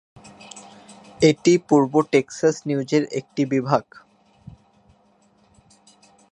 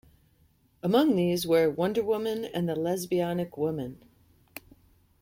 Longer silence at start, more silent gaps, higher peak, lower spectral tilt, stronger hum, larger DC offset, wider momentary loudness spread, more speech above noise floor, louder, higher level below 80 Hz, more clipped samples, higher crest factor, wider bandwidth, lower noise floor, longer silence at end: second, 0.55 s vs 0.85 s; neither; first, -2 dBFS vs -10 dBFS; about the same, -6 dB/octave vs -6 dB/octave; neither; neither; first, 21 LU vs 18 LU; about the same, 40 dB vs 38 dB; first, -20 LUFS vs -27 LUFS; about the same, -60 dBFS vs -62 dBFS; neither; about the same, 22 dB vs 18 dB; second, 10.5 kHz vs 16.5 kHz; second, -59 dBFS vs -65 dBFS; first, 2.5 s vs 0.6 s